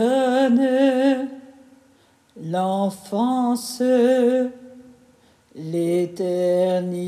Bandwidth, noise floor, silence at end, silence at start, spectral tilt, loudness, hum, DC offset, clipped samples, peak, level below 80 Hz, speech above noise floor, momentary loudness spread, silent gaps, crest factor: 14.5 kHz; -57 dBFS; 0 s; 0 s; -6 dB/octave; -20 LUFS; none; under 0.1%; under 0.1%; -8 dBFS; -72 dBFS; 37 dB; 11 LU; none; 14 dB